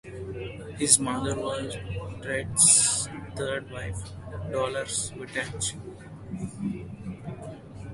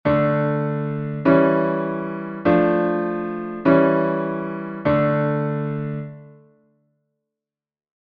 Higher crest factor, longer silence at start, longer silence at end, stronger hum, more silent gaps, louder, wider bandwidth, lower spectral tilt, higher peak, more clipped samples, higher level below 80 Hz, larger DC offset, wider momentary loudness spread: first, 26 dB vs 18 dB; about the same, 0.05 s vs 0.05 s; second, 0 s vs 1.75 s; neither; neither; second, -25 LUFS vs -21 LUFS; first, 12 kHz vs 5 kHz; second, -2.5 dB/octave vs -11 dB/octave; about the same, -2 dBFS vs -2 dBFS; neither; first, -48 dBFS vs -54 dBFS; neither; first, 20 LU vs 11 LU